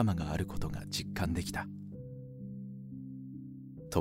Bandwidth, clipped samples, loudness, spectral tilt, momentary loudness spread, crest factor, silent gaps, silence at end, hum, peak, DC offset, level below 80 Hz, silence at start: 16 kHz; under 0.1%; -39 LUFS; -5.5 dB/octave; 12 LU; 22 dB; none; 0 s; none; -14 dBFS; under 0.1%; -50 dBFS; 0 s